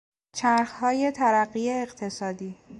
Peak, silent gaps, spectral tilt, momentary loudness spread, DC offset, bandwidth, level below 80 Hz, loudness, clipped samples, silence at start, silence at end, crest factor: -10 dBFS; none; -4.5 dB/octave; 11 LU; under 0.1%; 11.5 kHz; -66 dBFS; -25 LUFS; under 0.1%; 0.35 s; 0 s; 16 dB